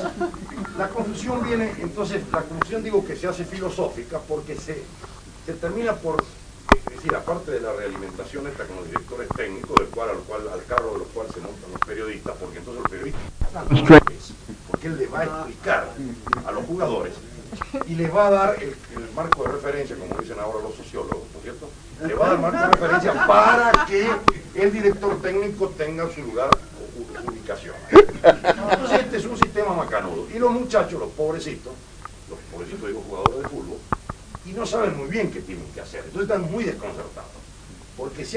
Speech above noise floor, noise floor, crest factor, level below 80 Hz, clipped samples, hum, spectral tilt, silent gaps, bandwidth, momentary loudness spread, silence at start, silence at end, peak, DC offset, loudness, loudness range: 21 dB; -42 dBFS; 22 dB; -40 dBFS; under 0.1%; none; -6 dB/octave; none; 10.5 kHz; 19 LU; 0 s; 0 s; 0 dBFS; under 0.1%; -22 LUFS; 10 LU